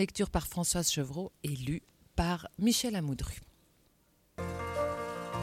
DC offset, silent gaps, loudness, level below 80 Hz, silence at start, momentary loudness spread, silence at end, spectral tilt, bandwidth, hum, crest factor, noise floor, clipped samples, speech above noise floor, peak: under 0.1%; none; -34 LUFS; -48 dBFS; 0 s; 12 LU; 0 s; -4 dB/octave; 17 kHz; none; 20 dB; -69 dBFS; under 0.1%; 36 dB; -16 dBFS